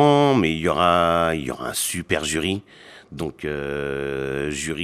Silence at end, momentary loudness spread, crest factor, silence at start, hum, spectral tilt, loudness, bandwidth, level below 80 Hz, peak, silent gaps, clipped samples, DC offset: 0 s; 12 LU; 18 dB; 0 s; none; -4.5 dB/octave; -22 LUFS; 14.5 kHz; -46 dBFS; -4 dBFS; none; under 0.1%; under 0.1%